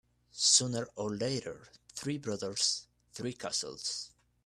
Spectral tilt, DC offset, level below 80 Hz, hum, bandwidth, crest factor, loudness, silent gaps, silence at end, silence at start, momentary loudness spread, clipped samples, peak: -2.5 dB/octave; under 0.1%; -70 dBFS; 60 Hz at -65 dBFS; 14 kHz; 24 dB; -32 LUFS; none; 0.35 s; 0.35 s; 22 LU; under 0.1%; -10 dBFS